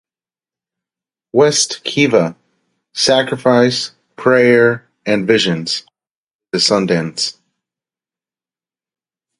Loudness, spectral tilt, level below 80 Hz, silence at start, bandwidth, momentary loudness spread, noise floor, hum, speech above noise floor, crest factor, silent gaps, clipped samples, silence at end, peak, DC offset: -14 LUFS; -3.5 dB/octave; -60 dBFS; 1.35 s; 11.5 kHz; 10 LU; under -90 dBFS; none; over 76 dB; 16 dB; 6.11-6.28 s, 6.34-6.39 s; under 0.1%; 2.1 s; 0 dBFS; under 0.1%